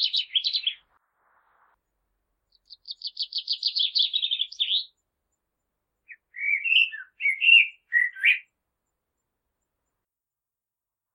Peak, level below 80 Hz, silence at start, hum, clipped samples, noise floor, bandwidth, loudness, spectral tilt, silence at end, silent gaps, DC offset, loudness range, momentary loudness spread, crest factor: -6 dBFS; -84 dBFS; 0 s; none; under 0.1%; -89 dBFS; 13.5 kHz; -22 LUFS; 5 dB/octave; 2.75 s; none; under 0.1%; 9 LU; 15 LU; 22 dB